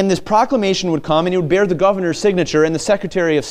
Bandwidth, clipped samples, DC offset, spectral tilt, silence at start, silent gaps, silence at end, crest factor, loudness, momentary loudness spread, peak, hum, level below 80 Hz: 13.5 kHz; under 0.1%; under 0.1%; -5 dB/octave; 0 s; none; 0 s; 14 dB; -16 LUFS; 2 LU; -2 dBFS; none; -44 dBFS